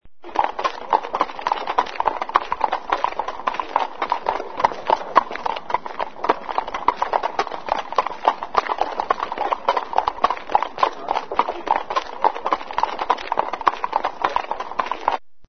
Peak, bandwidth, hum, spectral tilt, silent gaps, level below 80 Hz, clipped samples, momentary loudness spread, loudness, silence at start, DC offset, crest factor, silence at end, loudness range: 0 dBFS; 6.6 kHz; none; -3.5 dB/octave; none; -52 dBFS; under 0.1%; 5 LU; -23 LUFS; 0 s; 1%; 22 dB; 0 s; 1 LU